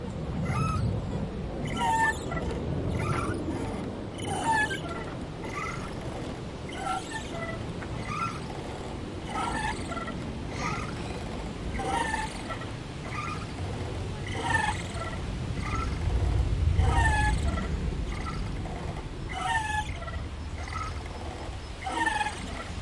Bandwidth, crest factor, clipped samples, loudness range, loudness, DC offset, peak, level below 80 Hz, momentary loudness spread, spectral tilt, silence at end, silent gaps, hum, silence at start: 11.5 kHz; 20 dB; under 0.1%; 5 LU; -31 LUFS; under 0.1%; -12 dBFS; -38 dBFS; 10 LU; -5.5 dB/octave; 0 s; none; none; 0 s